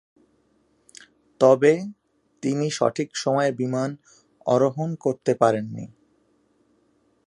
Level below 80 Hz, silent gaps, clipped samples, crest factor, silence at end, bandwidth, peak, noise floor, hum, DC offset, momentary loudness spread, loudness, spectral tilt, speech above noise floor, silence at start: -70 dBFS; none; under 0.1%; 22 dB; 1.4 s; 11.5 kHz; -2 dBFS; -65 dBFS; none; under 0.1%; 16 LU; -22 LUFS; -6 dB/octave; 43 dB; 1.4 s